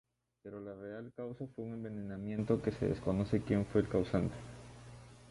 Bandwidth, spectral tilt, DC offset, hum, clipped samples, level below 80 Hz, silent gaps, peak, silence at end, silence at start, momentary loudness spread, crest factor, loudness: 11.5 kHz; -8.5 dB/octave; under 0.1%; none; under 0.1%; -56 dBFS; none; -18 dBFS; 0 s; 0.45 s; 20 LU; 20 dB; -37 LUFS